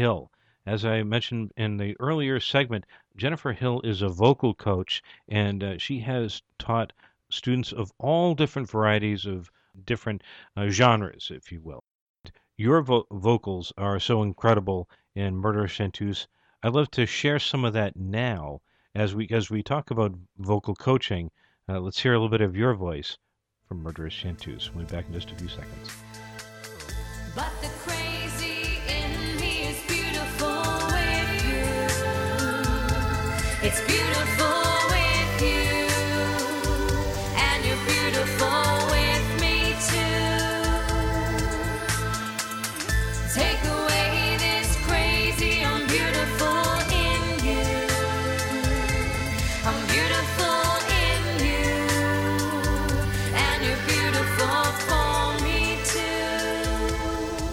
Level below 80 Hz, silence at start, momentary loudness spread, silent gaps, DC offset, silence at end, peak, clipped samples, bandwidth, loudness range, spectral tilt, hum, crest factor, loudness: -34 dBFS; 0 s; 12 LU; 11.91-12.14 s; under 0.1%; 0 s; -4 dBFS; under 0.1%; 17 kHz; 6 LU; -4 dB/octave; none; 20 dB; -25 LUFS